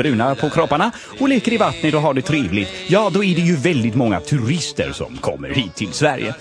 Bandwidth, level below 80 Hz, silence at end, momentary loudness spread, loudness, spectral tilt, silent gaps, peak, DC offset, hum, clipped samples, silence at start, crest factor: 10.5 kHz; -46 dBFS; 0 s; 6 LU; -18 LUFS; -5.5 dB/octave; none; 0 dBFS; under 0.1%; none; under 0.1%; 0 s; 18 dB